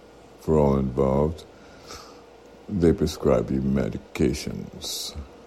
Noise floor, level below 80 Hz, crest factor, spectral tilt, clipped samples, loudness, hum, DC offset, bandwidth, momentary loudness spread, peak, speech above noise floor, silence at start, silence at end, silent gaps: -48 dBFS; -38 dBFS; 18 dB; -6.5 dB/octave; under 0.1%; -24 LUFS; none; under 0.1%; 15.5 kHz; 18 LU; -6 dBFS; 25 dB; 0.4 s; 0.05 s; none